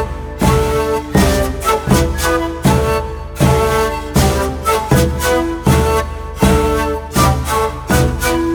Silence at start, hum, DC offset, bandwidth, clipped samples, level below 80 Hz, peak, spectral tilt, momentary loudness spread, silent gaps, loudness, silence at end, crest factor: 0 s; none; under 0.1%; over 20 kHz; under 0.1%; -22 dBFS; 0 dBFS; -5.5 dB/octave; 4 LU; none; -15 LUFS; 0 s; 14 dB